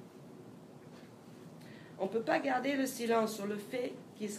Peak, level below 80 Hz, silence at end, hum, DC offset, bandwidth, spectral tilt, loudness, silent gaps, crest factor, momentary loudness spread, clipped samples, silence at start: -16 dBFS; -84 dBFS; 0 s; none; under 0.1%; 15.5 kHz; -4.5 dB/octave; -35 LUFS; none; 20 dB; 21 LU; under 0.1%; 0 s